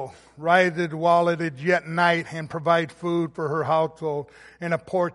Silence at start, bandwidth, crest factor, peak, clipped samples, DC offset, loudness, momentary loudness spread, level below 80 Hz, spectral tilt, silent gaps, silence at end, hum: 0 s; 11.5 kHz; 20 dB; -4 dBFS; under 0.1%; under 0.1%; -23 LUFS; 11 LU; -64 dBFS; -6.5 dB/octave; none; 0 s; none